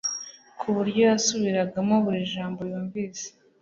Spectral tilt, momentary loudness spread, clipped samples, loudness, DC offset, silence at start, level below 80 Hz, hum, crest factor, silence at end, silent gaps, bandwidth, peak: -4.5 dB/octave; 14 LU; under 0.1%; -25 LUFS; under 0.1%; 0.05 s; -66 dBFS; none; 16 dB; 0.35 s; none; 7.6 kHz; -8 dBFS